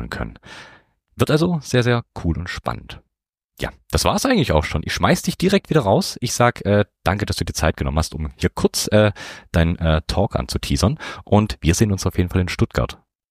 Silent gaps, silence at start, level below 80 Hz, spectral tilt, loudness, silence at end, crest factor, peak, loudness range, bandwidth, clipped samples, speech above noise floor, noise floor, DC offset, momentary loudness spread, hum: none; 0 s; -32 dBFS; -5.5 dB/octave; -20 LUFS; 0.35 s; 18 dB; -2 dBFS; 4 LU; 15.5 kHz; under 0.1%; 62 dB; -81 dBFS; under 0.1%; 12 LU; none